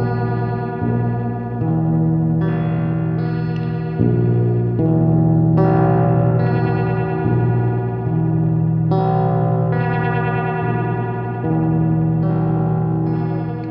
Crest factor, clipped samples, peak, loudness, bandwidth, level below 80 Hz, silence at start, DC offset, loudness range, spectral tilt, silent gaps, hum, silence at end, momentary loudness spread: 14 dB; under 0.1%; -4 dBFS; -18 LUFS; 4.6 kHz; -42 dBFS; 0 s; under 0.1%; 3 LU; -12 dB/octave; none; 60 Hz at -35 dBFS; 0 s; 6 LU